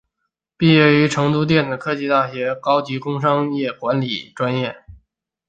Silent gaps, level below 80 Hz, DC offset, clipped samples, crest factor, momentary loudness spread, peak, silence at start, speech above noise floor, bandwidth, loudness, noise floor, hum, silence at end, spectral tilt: none; -56 dBFS; under 0.1%; under 0.1%; 18 dB; 10 LU; -2 dBFS; 0.6 s; 59 dB; 9 kHz; -18 LUFS; -77 dBFS; none; 0.55 s; -6.5 dB/octave